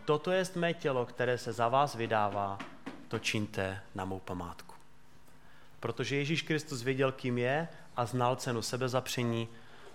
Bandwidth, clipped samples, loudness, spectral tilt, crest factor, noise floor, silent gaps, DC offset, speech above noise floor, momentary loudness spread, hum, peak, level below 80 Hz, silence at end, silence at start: 16.5 kHz; under 0.1%; -33 LUFS; -5 dB/octave; 20 dB; -61 dBFS; none; 0.3%; 28 dB; 11 LU; none; -14 dBFS; -68 dBFS; 0 s; 0 s